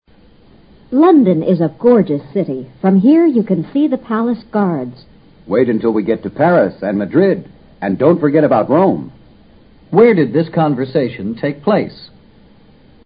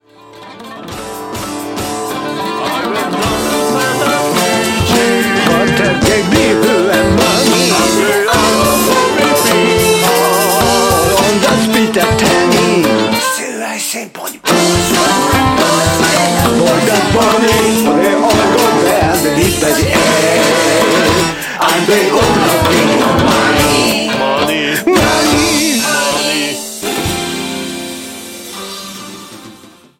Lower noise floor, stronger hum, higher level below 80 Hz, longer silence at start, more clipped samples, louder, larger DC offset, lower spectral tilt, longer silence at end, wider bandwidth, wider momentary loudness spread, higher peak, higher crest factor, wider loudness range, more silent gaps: first, -46 dBFS vs -39 dBFS; neither; second, -52 dBFS vs -34 dBFS; first, 0.9 s vs 0.3 s; neither; second, -14 LUFS vs -11 LUFS; neither; first, -12.5 dB/octave vs -3.5 dB/octave; first, 1 s vs 0.35 s; second, 5.2 kHz vs 16.5 kHz; about the same, 11 LU vs 11 LU; about the same, 0 dBFS vs 0 dBFS; about the same, 14 dB vs 12 dB; about the same, 3 LU vs 5 LU; neither